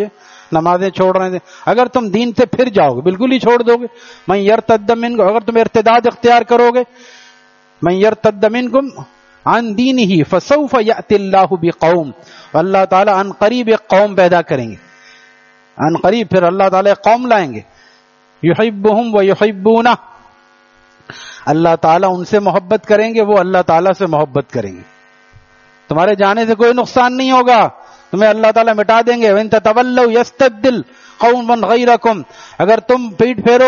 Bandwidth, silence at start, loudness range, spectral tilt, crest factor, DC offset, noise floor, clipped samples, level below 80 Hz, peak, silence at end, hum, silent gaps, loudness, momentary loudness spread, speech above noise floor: 7.2 kHz; 0 s; 3 LU; -4.5 dB/octave; 12 dB; under 0.1%; -49 dBFS; under 0.1%; -52 dBFS; 0 dBFS; 0 s; none; none; -12 LUFS; 8 LU; 38 dB